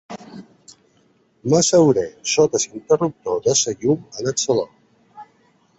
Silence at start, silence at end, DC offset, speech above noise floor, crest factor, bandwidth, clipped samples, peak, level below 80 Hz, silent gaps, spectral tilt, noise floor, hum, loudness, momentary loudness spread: 0.1 s; 0.55 s; under 0.1%; 41 dB; 18 dB; 8.2 kHz; under 0.1%; -2 dBFS; -58 dBFS; none; -4 dB/octave; -59 dBFS; none; -19 LUFS; 11 LU